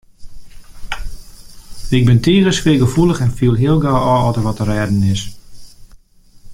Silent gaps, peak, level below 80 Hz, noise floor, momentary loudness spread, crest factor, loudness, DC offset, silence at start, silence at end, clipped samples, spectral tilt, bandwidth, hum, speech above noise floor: none; -2 dBFS; -30 dBFS; -45 dBFS; 16 LU; 14 dB; -14 LUFS; under 0.1%; 0.2 s; 0 s; under 0.1%; -6.5 dB/octave; 15.5 kHz; none; 32 dB